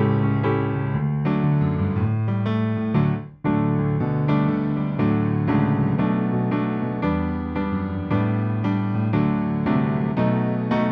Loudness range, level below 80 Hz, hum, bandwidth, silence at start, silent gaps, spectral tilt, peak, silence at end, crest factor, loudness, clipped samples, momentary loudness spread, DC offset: 2 LU; -44 dBFS; none; 5.2 kHz; 0 s; none; -11 dB/octave; -8 dBFS; 0 s; 14 dB; -22 LUFS; under 0.1%; 4 LU; under 0.1%